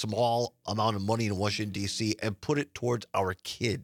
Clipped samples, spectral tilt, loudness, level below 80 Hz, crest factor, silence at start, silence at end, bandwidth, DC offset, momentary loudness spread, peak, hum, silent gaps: under 0.1%; -5 dB/octave; -30 LUFS; -66 dBFS; 18 dB; 0 s; 0 s; 17.5 kHz; under 0.1%; 4 LU; -12 dBFS; none; none